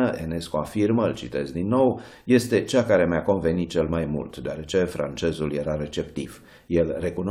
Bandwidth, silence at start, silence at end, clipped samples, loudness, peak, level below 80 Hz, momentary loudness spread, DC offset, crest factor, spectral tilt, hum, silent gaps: 15.5 kHz; 0 s; 0 s; under 0.1%; -24 LUFS; -6 dBFS; -46 dBFS; 10 LU; under 0.1%; 18 dB; -6.5 dB/octave; none; none